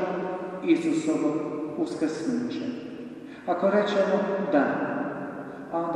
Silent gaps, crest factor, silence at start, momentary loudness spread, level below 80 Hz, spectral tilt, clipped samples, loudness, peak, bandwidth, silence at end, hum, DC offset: none; 16 dB; 0 s; 13 LU; -70 dBFS; -6 dB/octave; under 0.1%; -27 LUFS; -10 dBFS; 11 kHz; 0 s; none; under 0.1%